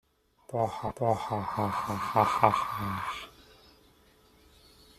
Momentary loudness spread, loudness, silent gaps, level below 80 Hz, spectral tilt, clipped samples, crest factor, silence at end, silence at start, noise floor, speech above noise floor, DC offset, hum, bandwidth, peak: 12 LU; -30 LUFS; none; -60 dBFS; -6 dB/octave; under 0.1%; 28 dB; 1.6 s; 0.5 s; -61 dBFS; 32 dB; under 0.1%; none; 15 kHz; -4 dBFS